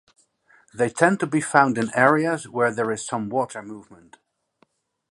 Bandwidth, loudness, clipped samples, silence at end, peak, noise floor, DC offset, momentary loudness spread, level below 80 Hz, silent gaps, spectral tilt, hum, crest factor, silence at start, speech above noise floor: 11.5 kHz; -21 LUFS; under 0.1%; 1.2 s; 0 dBFS; -65 dBFS; under 0.1%; 17 LU; -68 dBFS; none; -5.5 dB/octave; none; 22 dB; 0.75 s; 43 dB